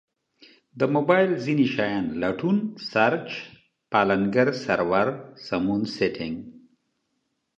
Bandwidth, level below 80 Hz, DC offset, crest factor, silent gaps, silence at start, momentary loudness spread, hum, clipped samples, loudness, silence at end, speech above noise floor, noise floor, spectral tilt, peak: 8 kHz; -60 dBFS; under 0.1%; 20 dB; none; 0.75 s; 12 LU; none; under 0.1%; -24 LUFS; 1 s; 52 dB; -76 dBFS; -7 dB/octave; -4 dBFS